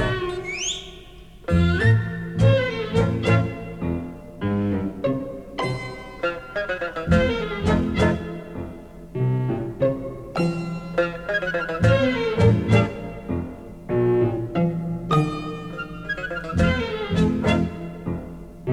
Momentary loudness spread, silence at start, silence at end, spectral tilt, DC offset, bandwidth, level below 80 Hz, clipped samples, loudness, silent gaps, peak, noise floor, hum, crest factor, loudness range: 14 LU; 0 s; 0 s; -6.5 dB/octave; under 0.1%; 10.5 kHz; -38 dBFS; under 0.1%; -23 LUFS; none; -6 dBFS; -43 dBFS; none; 18 dB; 4 LU